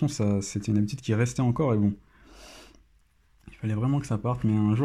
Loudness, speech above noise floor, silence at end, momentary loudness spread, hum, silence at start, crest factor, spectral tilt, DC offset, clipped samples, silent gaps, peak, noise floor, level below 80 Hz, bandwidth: -27 LUFS; 38 dB; 0 s; 15 LU; none; 0 s; 16 dB; -7 dB/octave; under 0.1%; under 0.1%; none; -12 dBFS; -63 dBFS; -52 dBFS; 12 kHz